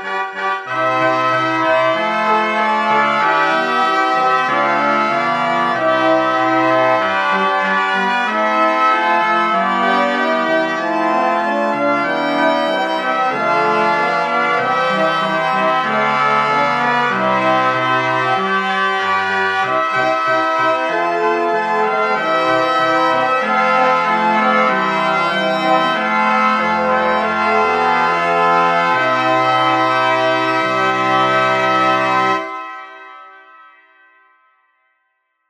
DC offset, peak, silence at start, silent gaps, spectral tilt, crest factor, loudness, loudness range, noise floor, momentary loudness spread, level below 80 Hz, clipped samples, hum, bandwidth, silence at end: under 0.1%; -2 dBFS; 0 s; none; -4.5 dB/octave; 14 dB; -15 LUFS; 2 LU; -68 dBFS; 3 LU; -64 dBFS; under 0.1%; none; 12 kHz; 2.1 s